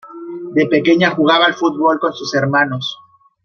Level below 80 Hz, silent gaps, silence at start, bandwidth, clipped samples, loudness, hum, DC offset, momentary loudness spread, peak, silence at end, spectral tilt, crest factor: -62 dBFS; none; 0.05 s; 6.8 kHz; under 0.1%; -14 LUFS; none; under 0.1%; 12 LU; -2 dBFS; 0.5 s; -5.5 dB/octave; 14 dB